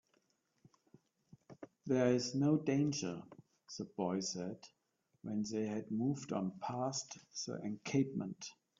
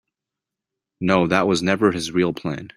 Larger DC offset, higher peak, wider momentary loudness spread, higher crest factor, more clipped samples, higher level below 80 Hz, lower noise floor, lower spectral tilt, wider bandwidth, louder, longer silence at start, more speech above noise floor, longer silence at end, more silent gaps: neither; second, -20 dBFS vs -2 dBFS; first, 17 LU vs 7 LU; about the same, 20 dB vs 20 dB; neither; second, -80 dBFS vs -56 dBFS; second, -78 dBFS vs -86 dBFS; about the same, -5.5 dB/octave vs -5.5 dB/octave; second, 7.6 kHz vs 15 kHz; second, -38 LUFS vs -20 LUFS; first, 1.5 s vs 1 s; second, 41 dB vs 66 dB; first, 0.25 s vs 0.1 s; neither